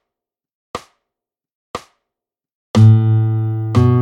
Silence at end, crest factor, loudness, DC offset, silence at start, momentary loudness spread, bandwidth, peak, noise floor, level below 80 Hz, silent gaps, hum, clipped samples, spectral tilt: 0 s; 16 dB; -14 LUFS; under 0.1%; 0.75 s; 22 LU; 7.8 kHz; 0 dBFS; -85 dBFS; -50 dBFS; 1.55-1.74 s, 2.54-2.74 s; none; under 0.1%; -8.5 dB/octave